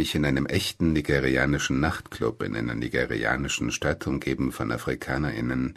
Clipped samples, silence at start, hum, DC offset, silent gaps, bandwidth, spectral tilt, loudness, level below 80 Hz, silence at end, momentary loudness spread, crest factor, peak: under 0.1%; 0 s; none; under 0.1%; none; 13.5 kHz; -5 dB/octave; -26 LUFS; -42 dBFS; 0.05 s; 6 LU; 20 dB; -6 dBFS